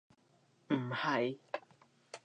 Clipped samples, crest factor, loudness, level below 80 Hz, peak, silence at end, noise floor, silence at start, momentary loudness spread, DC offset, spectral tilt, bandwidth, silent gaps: under 0.1%; 20 dB; -37 LUFS; -88 dBFS; -18 dBFS; 0.05 s; -71 dBFS; 0.7 s; 12 LU; under 0.1%; -6 dB/octave; 10 kHz; none